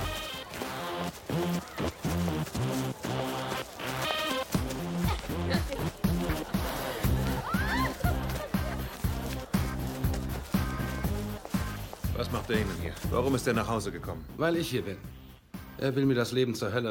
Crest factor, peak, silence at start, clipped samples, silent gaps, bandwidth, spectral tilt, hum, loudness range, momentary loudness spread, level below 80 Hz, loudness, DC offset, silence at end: 18 dB; -14 dBFS; 0 s; under 0.1%; none; 17 kHz; -5.5 dB/octave; none; 2 LU; 7 LU; -40 dBFS; -32 LUFS; under 0.1%; 0 s